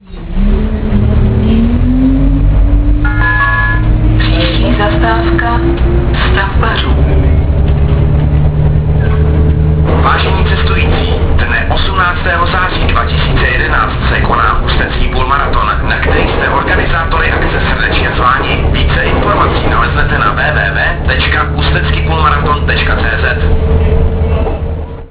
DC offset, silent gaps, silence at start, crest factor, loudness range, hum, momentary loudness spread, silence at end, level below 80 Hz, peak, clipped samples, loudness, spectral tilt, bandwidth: under 0.1%; none; 0.1 s; 10 dB; 1 LU; none; 2 LU; 0 s; -12 dBFS; 0 dBFS; under 0.1%; -11 LUFS; -10 dB/octave; 4 kHz